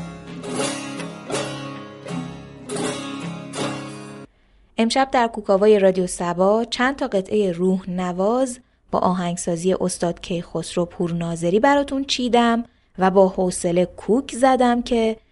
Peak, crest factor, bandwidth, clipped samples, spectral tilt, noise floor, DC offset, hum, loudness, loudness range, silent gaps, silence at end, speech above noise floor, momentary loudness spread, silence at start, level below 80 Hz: -2 dBFS; 18 dB; 11.5 kHz; under 0.1%; -5 dB/octave; -56 dBFS; under 0.1%; none; -21 LUFS; 9 LU; none; 0.15 s; 36 dB; 15 LU; 0 s; -50 dBFS